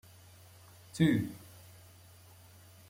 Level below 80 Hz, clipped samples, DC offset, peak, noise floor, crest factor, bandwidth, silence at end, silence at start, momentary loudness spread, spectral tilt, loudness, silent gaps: -66 dBFS; under 0.1%; under 0.1%; -16 dBFS; -57 dBFS; 22 dB; 16.5 kHz; 1.5 s; 0.95 s; 27 LU; -6.5 dB/octave; -31 LUFS; none